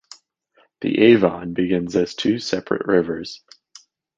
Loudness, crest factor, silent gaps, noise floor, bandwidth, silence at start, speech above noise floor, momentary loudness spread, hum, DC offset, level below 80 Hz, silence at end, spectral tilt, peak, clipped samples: -19 LUFS; 20 dB; none; -61 dBFS; 7.8 kHz; 0.8 s; 42 dB; 14 LU; none; under 0.1%; -54 dBFS; 0.8 s; -6 dB/octave; -2 dBFS; under 0.1%